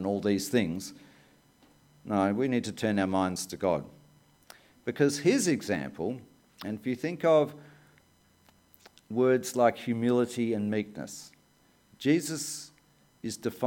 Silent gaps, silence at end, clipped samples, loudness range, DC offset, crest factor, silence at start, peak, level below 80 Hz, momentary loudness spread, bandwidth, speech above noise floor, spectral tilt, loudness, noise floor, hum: none; 0 s; under 0.1%; 3 LU; under 0.1%; 20 dB; 0 s; -10 dBFS; -68 dBFS; 15 LU; 17.5 kHz; 36 dB; -5 dB/octave; -29 LUFS; -65 dBFS; none